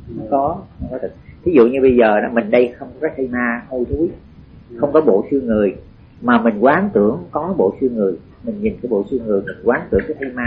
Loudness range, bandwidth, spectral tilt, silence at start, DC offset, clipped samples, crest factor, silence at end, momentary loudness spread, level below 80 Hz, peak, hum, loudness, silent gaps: 3 LU; 5.2 kHz; -6 dB/octave; 0 s; under 0.1%; under 0.1%; 16 dB; 0 s; 12 LU; -40 dBFS; -2 dBFS; none; -17 LUFS; none